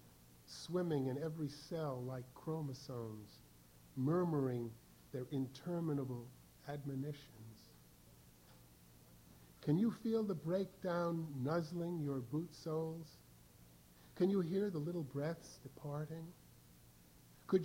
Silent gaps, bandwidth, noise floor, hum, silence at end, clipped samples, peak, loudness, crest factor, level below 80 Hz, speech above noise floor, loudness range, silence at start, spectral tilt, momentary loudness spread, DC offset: none; 19.5 kHz; -64 dBFS; none; 0 s; under 0.1%; -22 dBFS; -42 LUFS; 20 dB; -72 dBFS; 24 dB; 6 LU; 0.05 s; -7.5 dB/octave; 21 LU; under 0.1%